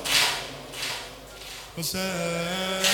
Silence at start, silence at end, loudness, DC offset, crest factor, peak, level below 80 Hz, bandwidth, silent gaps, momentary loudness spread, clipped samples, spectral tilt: 0 s; 0 s; -27 LUFS; under 0.1%; 22 dB; -6 dBFS; -54 dBFS; 19 kHz; none; 17 LU; under 0.1%; -2 dB/octave